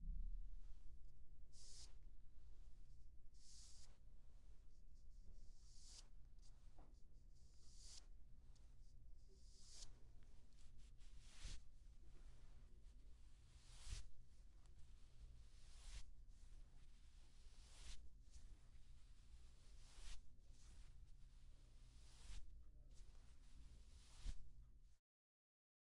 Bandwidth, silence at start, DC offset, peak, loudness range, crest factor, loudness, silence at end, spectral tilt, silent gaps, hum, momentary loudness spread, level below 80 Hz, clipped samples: 11.5 kHz; 0 s; under 0.1%; -38 dBFS; 4 LU; 18 dB; -65 LUFS; 1 s; -3 dB/octave; none; none; 9 LU; -62 dBFS; under 0.1%